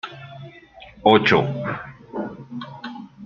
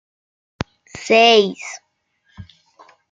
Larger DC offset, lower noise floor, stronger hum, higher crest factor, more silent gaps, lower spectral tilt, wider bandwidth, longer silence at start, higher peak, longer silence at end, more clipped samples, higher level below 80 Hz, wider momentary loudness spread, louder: neither; second, -45 dBFS vs -65 dBFS; neither; about the same, 22 dB vs 20 dB; neither; first, -6.5 dB/octave vs -3.5 dB/octave; second, 7.2 kHz vs 9.2 kHz; second, 0.05 s vs 0.95 s; about the same, -2 dBFS vs 0 dBFS; second, 0 s vs 0.7 s; neither; about the same, -56 dBFS vs -54 dBFS; about the same, 23 LU vs 22 LU; second, -20 LUFS vs -13 LUFS